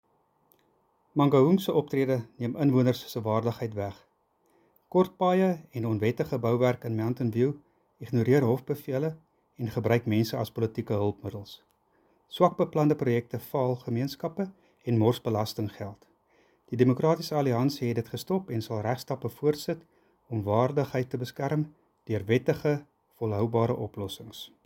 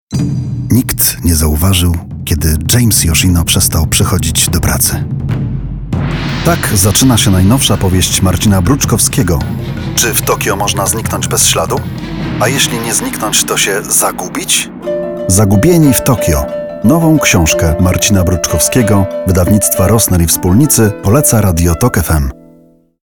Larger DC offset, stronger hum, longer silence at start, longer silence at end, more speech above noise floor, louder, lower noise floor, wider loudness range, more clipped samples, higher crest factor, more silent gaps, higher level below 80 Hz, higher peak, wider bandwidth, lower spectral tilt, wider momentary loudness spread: neither; neither; first, 1.15 s vs 0.1 s; second, 0.2 s vs 0.7 s; first, 42 dB vs 34 dB; second, -28 LUFS vs -10 LUFS; first, -69 dBFS vs -44 dBFS; about the same, 4 LU vs 3 LU; neither; first, 20 dB vs 10 dB; neither; second, -66 dBFS vs -24 dBFS; second, -8 dBFS vs 0 dBFS; second, 17 kHz vs over 20 kHz; first, -7.5 dB/octave vs -4 dB/octave; first, 12 LU vs 9 LU